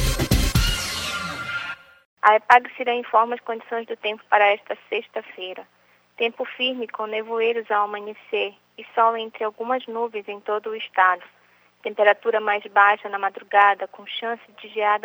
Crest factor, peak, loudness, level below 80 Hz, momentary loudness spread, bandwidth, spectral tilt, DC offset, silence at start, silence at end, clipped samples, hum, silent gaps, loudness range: 20 dB; -2 dBFS; -22 LUFS; -36 dBFS; 14 LU; over 20 kHz; -4 dB/octave; under 0.1%; 0 s; 0.05 s; under 0.1%; 60 Hz at -70 dBFS; 2.05-2.17 s; 5 LU